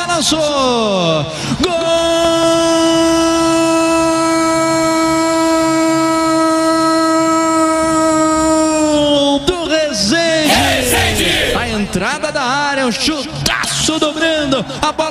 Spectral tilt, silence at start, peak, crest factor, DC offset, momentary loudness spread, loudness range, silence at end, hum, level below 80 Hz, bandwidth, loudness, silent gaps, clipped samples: -3.5 dB/octave; 0 s; 0 dBFS; 14 dB; under 0.1%; 4 LU; 2 LU; 0 s; none; -36 dBFS; 16 kHz; -13 LUFS; none; under 0.1%